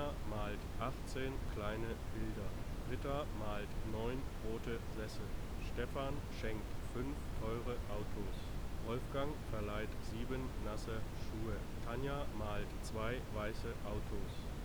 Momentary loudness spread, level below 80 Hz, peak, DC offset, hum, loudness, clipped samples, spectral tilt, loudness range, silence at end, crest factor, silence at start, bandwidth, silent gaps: 4 LU; -46 dBFS; -26 dBFS; under 0.1%; none; -44 LUFS; under 0.1%; -6 dB/octave; 1 LU; 0 s; 14 dB; 0 s; over 20 kHz; none